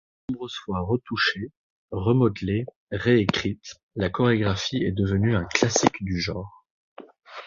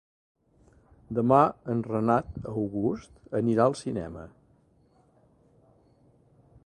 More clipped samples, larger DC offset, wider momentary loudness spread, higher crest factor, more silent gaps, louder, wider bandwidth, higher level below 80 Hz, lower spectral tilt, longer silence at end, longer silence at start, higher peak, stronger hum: neither; neither; about the same, 14 LU vs 15 LU; about the same, 24 dB vs 24 dB; first, 1.57-1.88 s, 2.76-2.87 s, 3.83-3.89 s, 6.70-6.96 s vs none; first, -24 LUFS vs -27 LUFS; second, 7.4 kHz vs 11 kHz; first, -46 dBFS vs -56 dBFS; second, -5 dB/octave vs -8 dB/octave; second, 0 s vs 2.4 s; second, 0.3 s vs 1.1 s; first, -2 dBFS vs -6 dBFS; neither